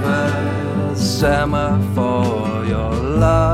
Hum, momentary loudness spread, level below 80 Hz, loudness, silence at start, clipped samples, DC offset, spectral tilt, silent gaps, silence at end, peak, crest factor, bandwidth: none; 5 LU; -28 dBFS; -18 LUFS; 0 s; under 0.1%; under 0.1%; -6.5 dB/octave; none; 0 s; -2 dBFS; 14 dB; 15.5 kHz